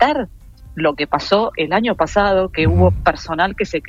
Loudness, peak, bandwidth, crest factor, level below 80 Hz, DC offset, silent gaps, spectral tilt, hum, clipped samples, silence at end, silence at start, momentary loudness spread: -17 LUFS; -2 dBFS; 7.6 kHz; 16 dB; -34 dBFS; under 0.1%; none; -6.5 dB/octave; none; under 0.1%; 0 s; 0 s; 6 LU